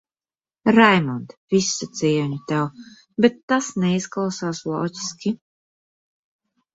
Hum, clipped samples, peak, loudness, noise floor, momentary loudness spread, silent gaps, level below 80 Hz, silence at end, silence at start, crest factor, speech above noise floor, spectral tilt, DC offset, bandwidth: none; under 0.1%; -2 dBFS; -21 LUFS; under -90 dBFS; 13 LU; 1.37-1.48 s, 3.43-3.48 s; -62 dBFS; 1.4 s; 0.65 s; 20 dB; over 69 dB; -5 dB/octave; under 0.1%; 8 kHz